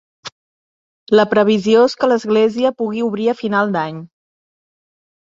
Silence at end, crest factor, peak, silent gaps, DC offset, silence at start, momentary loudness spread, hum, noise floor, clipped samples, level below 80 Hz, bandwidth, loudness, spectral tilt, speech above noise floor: 1.15 s; 16 dB; -2 dBFS; 0.32-1.07 s; under 0.1%; 0.25 s; 18 LU; none; under -90 dBFS; under 0.1%; -62 dBFS; 7.6 kHz; -16 LUFS; -6 dB/octave; over 75 dB